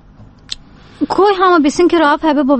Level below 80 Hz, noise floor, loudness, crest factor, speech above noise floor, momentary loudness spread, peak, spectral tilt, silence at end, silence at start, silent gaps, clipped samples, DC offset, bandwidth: -42 dBFS; -40 dBFS; -12 LUFS; 12 dB; 29 dB; 18 LU; 0 dBFS; -4 dB/octave; 0 s; 0.2 s; none; under 0.1%; under 0.1%; 8.8 kHz